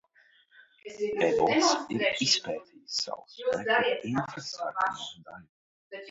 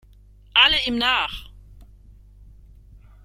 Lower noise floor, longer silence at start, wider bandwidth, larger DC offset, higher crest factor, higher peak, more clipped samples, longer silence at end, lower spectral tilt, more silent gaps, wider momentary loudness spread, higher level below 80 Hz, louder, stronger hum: first, -63 dBFS vs -50 dBFS; first, 0.85 s vs 0.55 s; second, 8 kHz vs 16 kHz; neither; about the same, 20 dB vs 22 dB; second, -10 dBFS vs -2 dBFS; neither; second, 0 s vs 1.4 s; about the same, -3 dB/octave vs -2.5 dB/octave; first, 5.49-5.91 s vs none; first, 21 LU vs 13 LU; second, -70 dBFS vs -44 dBFS; second, -28 LUFS vs -18 LUFS; second, none vs 50 Hz at -45 dBFS